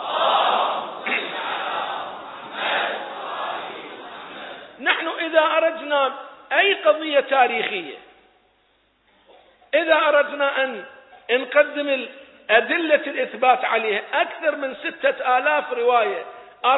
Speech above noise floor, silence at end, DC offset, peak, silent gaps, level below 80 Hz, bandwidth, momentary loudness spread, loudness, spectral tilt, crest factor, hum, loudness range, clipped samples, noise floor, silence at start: 42 dB; 0 s; under 0.1%; -2 dBFS; none; -74 dBFS; 4.1 kHz; 18 LU; -21 LUFS; -7 dB/octave; 20 dB; none; 6 LU; under 0.1%; -63 dBFS; 0 s